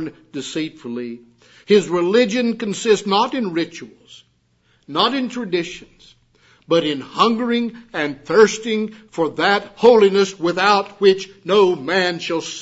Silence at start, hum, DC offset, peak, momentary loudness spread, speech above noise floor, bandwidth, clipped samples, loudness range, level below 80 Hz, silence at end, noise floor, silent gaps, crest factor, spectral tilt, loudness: 0 s; none; under 0.1%; 0 dBFS; 13 LU; 42 dB; 8 kHz; under 0.1%; 7 LU; -62 dBFS; 0 s; -61 dBFS; none; 18 dB; -4.5 dB/octave; -18 LUFS